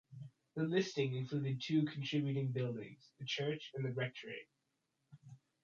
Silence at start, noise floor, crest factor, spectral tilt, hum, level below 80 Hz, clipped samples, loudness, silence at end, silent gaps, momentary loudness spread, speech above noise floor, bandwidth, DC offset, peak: 0.1 s; -85 dBFS; 18 dB; -6.5 dB/octave; none; -82 dBFS; under 0.1%; -39 LUFS; 0.3 s; none; 17 LU; 46 dB; 7.4 kHz; under 0.1%; -24 dBFS